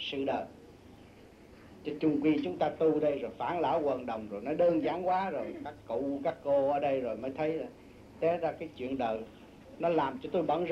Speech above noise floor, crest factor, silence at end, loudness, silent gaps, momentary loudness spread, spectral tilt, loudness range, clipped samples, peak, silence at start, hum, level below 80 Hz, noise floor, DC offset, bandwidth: 23 dB; 16 dB; 0 s; -32 LUFS; none; 11 LU; -7.5 dB/octave; 4 LU; under 0.1%; -16 dBFS; 0 s; none; -64 dBFS; -55 dBFS; under 0.1%; 8.8 kHz